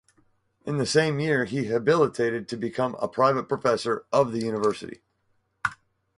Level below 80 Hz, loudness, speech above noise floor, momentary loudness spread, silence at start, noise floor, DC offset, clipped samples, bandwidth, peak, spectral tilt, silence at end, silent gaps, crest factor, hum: -62 dBFS; -25 LUFS; 46 dB; 9 LU; 0.65 s; -71 dBFS; under 0.1%; under 0.1%; 11.5 kHz; -6 dBFS; -5.5 dB/octave; 0.45 s; none; 20 dB; none